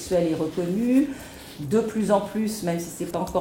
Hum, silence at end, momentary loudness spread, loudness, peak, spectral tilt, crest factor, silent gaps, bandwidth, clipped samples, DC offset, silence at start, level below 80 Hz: none; 0 s; 8 LU; -25 LUFS; -8 dBFS; -6 dB/octave; 16 dB; none; 17 kHz; under 0.1%; under 0.1%; 0 s; -52 dBFS